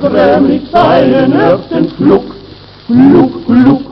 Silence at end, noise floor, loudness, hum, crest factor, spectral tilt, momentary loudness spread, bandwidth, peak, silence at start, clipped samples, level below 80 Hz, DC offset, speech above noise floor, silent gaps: 0 s; -32 dBFS; -8 LUFS; none; 8 dB; -9 dB/octave; 6 LU; 5.8 kHz; 0 dBFS; 0 s; 1%; -38 dBFS; under 0.1%; 25 dB; none